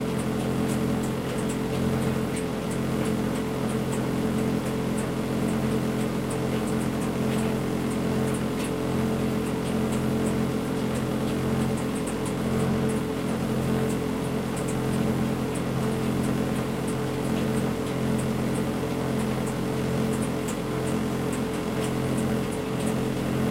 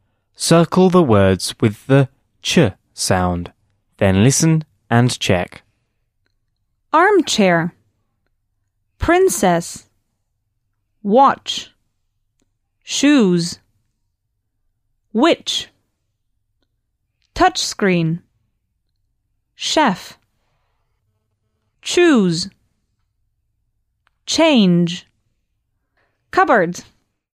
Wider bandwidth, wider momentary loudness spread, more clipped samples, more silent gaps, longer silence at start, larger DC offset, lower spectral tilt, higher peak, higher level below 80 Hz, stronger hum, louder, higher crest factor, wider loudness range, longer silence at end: about the same, 16 kHz vs 15.5 kHz; second, 2 LU vs 14 LU; neither; neither; second, 0 s vs 0.4 s; neither; about the same, -6 dB/octave vs -5 dB/octave; second, -14 dBFS vs -2 dBFS; about the same, -44 dBFS vs -48 dBFS; neither; second, -27 LUFS vs -16 LUFS; second, 12 dB vs 18 dB; second, 1 LU vs 5 LU; second, 0 s vs 0.55 s